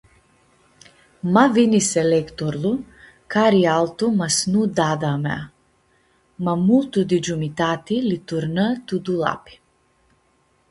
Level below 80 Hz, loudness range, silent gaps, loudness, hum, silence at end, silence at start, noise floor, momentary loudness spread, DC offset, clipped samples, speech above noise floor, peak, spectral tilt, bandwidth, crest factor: -56 dBFS; 4 LU; none; -20 LUFS; none; 1.35 s; 1.25 s; -62 dBFS; 10 LU; under 0.1%; under 0.1%; 43 dB; 0 dBFS; -5 dB/octave; 11.5 kHz; 20 dB